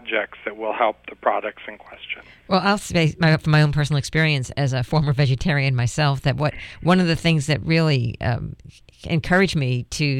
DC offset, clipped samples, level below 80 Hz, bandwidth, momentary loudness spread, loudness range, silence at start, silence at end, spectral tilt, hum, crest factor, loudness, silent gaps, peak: under 0.1%; under 0.1%; -42 dBFS; 12 kHz; 13 LU; 2 LU; 0.05 s; 0 s; -6 dB/octave; 60 Hz at -45 dBFS; 16 dB; -21 LUFS; none; -6 dBFS